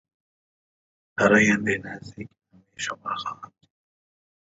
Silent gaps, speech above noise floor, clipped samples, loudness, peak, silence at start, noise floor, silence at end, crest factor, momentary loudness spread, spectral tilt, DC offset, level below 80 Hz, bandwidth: none; over 66 dB; under 0.1%; -23 LUFS; -4 dBFS; 1.2 s; under -90 dBFS; 1.15 s; 22 dB; 24 LU; -4.5 dB/octave; under 0.1%; -60 dBFS; 8 kHz